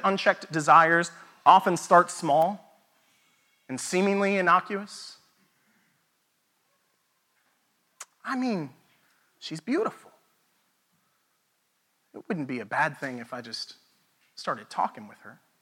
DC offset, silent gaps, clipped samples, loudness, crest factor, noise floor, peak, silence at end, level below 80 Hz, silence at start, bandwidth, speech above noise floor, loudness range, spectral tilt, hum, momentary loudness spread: under 0.1%; none; under 0.1%; -25 LUFS; 24 dB; -73 dBFS; -4 dBFS; 0.3 s; -88 dBFS; 0 s; 18 kHz; 48 dB; 15 LU; -4.5 dB/octave; none; 22 LU